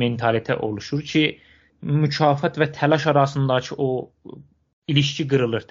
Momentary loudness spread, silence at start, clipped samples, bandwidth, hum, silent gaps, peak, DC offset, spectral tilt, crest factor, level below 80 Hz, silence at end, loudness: 8 LU; 0 s; under 0.1%; 7.4 kHz; none; 4.73-4.82 s; -2 dBFS; under 0.1%; -5 dB/octave; 20 dB; -58 dBFS; 0.1 s; -21 LUFS